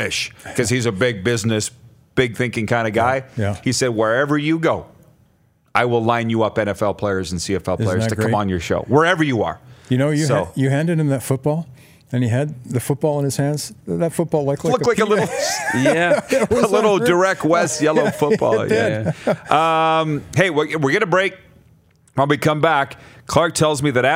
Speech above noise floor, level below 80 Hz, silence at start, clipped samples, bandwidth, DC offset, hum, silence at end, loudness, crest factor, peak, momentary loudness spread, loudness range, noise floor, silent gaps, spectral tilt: 40 dB; -52 dBFS; 0 s; under 0.1%; 16 kHz; under 0.1%; none; 0 s; -18 LUFS; 18 dB; 0 dBFS; 7 LU; 4 LU; -58 dBFS; none; -5 dB/octave